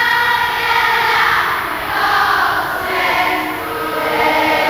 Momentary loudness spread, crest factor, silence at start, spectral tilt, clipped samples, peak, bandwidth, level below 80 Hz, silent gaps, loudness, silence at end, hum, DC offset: 6 LU; 14 dB; 0 s; -3 dB/octave; under 0.1%; -2 dBFS; 18 kHz; -44 dBFS; none; -14 LUFS; 0 s; none; 0.2%